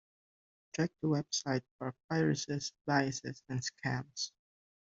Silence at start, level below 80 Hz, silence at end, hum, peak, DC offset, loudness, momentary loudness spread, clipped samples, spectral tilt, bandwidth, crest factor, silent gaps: 0.75 s; -72 dBFS; 0.65 s; none; -16 dBFS; under 0.1%; -36 LUFS; 9 LU; under 0.1%; -4.5 dB/octave; 8 kHz; 22 dB; 1.71-1.79 s, 2.04-2.09 s, 2.81-2.85 s